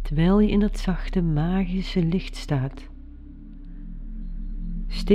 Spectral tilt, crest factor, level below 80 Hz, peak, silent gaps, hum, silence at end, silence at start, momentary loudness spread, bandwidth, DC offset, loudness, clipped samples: -8 dB/octave; 18 dB; -30 dBFS; -6 dBFS; none; none; 0 s; 0 s; 24 LU; 10.5 kHz; under 0.1%; -24 LUFS; under 0.1%